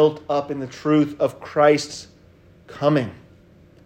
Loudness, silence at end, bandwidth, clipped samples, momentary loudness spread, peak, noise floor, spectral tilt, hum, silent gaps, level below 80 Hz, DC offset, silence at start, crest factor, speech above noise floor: -21 LUFS; 0.7 s; 10 kHz; under 0.1%; 14 LU; -4 dBFS; -51 dBFS; -6 dB/octave; none; none; -60 dBFS; under 0.1%; 0 s; 18 dB; 30 dB